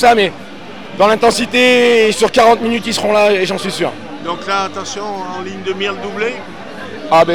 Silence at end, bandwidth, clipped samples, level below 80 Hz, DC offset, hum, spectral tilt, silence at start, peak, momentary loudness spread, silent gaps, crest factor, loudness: 0 s; 18.5 kHz; under 0.1%; -50 dBFS; 2%; none; -3.5 dB/octave; 0 s; 0 dBFS; 18 LU; none; 12 dB; -14 LUFS